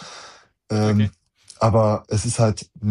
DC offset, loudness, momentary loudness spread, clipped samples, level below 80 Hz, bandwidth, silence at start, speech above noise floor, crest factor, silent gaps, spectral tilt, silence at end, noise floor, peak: under 0.1%; -21 LUFS; 9 LU; under 0.1%; -48 dBFS; 11 kHz; 0 s; 27 dB; 16 dB; none; -6.5 dB/octave; 0 s; -47 dBFS; -6 dBFS